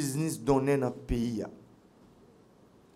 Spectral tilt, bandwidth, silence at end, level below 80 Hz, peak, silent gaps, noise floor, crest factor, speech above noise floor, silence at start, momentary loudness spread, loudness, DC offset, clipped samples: -6 dB/octave; 16 kHz; 1.35 s; -48 dBFS; -14 dBFS; none; -59 dBFS; 18 dB; 30 dB; 0 s; 10 LU; -30 LUFS; under 0.1%; under 0.1%